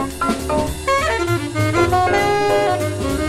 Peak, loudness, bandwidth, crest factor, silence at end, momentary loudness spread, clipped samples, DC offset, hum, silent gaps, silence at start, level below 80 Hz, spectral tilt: -2 dBFS; -18 LUFS; 16 kHz; 14 dB; 0 s; 5 LU; under 0.1%; under 0.1%; none; none; 0 s; -34 dBFS; -5 dB/octave